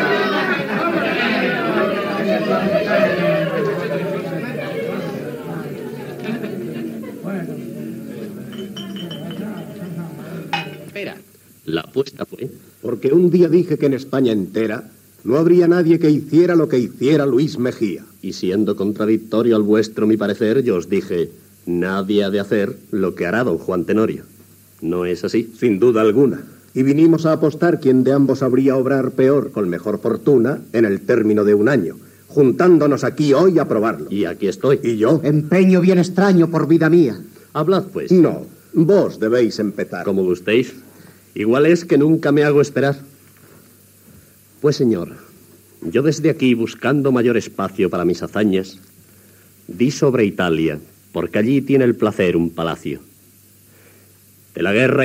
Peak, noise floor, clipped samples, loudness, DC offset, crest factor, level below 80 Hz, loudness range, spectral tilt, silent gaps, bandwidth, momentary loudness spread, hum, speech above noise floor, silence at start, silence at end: -2 dBFS; -49 dBFS; under 0.1%; -17 LUFS; under 0.1%; 16 dB; -58 dBFS; 11 LU; -7 dB/octave; none; 16 kHz; 15 LU; none; 33 dB; 0 s; 0 s